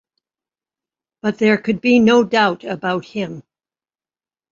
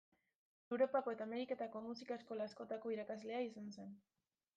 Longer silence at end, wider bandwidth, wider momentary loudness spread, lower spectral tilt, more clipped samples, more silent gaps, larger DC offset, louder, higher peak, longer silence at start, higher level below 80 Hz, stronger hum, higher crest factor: first, 1.1 s vs 0.6 s; about the same, 7.6 kHz vs 7.8 kHz; about the same, 14 LU vs 14 LU; about the same, -6 dB/octave vs -6 dB/octave; neither; neither; neither; first, -17 LUFS vs -44 LUFS; first, -2 dBFS vs -26 dBFS; first, 1.25 s vs 0.7 s; first, -60 dBFS vs under -90 dBFS; neither; about the same, 18 dB vs 20 dB